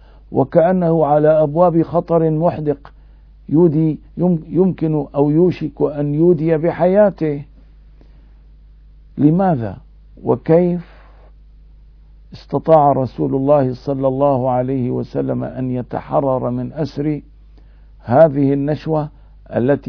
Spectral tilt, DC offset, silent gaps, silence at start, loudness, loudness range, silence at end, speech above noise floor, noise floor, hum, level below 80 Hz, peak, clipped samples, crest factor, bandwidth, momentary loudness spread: -11 dB/octave; under 0.1%; none; 0.3 s; -16 LUFS; 5 LU; 0 s; 28 dB; -43 dBFS; none; -42 dBFS; 0 dBFS; under 0.1%; 16 dB; 5.4 kHz; 10 LU